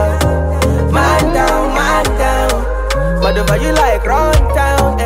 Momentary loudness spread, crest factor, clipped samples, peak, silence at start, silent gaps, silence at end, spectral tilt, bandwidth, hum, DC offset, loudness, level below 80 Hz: 3 LU; 10 dB; under 0.1%; -2 dBFS; 0 s; none; 0 s; -5.5 dB/octave; 16.5 kHz; none; under 0.1%; -13 LUFS; -16 dBFS